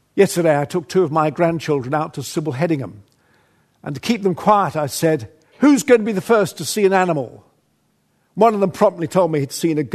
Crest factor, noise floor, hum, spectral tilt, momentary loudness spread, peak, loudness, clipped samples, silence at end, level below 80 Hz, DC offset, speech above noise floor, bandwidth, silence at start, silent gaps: 18 dB; -64 dBFS; none; -5.5 dB/octave; 9 LU; 0 dBFS; -18 LUFS; under 0.1%; 0 s; -62 dBFS; under 0.1%; 46 dB; 13.5 kHz; 0.15 s; none